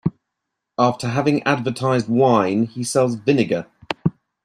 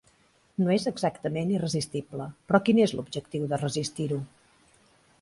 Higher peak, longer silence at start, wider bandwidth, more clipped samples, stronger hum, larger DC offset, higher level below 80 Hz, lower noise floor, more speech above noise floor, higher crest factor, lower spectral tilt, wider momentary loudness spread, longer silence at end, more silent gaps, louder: first, -2 dBFS vs -6 dBFS; second, 0.05 s vs 0.6 s; first, 13 kHz vs 11.5 kHz; neither; neither; neither; first, -56 dBFS vs -62 dBFS; first, -80 dBFS vs -64 dBFS; first, 61 dB vs 37 dB; second, 16 dB vs 22 dB; about the same, -6 dB/octave vs -6 dB/octave; second, 9 LU vs 12 LU; second, 0.35 s vs 0.95 s; neither; first, -20 LUFS vs -28 LUFS